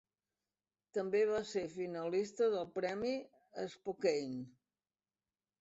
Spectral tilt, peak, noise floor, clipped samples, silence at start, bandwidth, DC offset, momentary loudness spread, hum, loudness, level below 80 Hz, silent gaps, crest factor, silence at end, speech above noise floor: -4.5 dB/octave; -22 dBFS; under -90 dBFS; under 0.1%; 0.95 s; 8 kHz; under 0.1%; 12 LU; none; -38 LUFS; -78 dBFS; none; 18 dB; 1.1 s; over 53 dB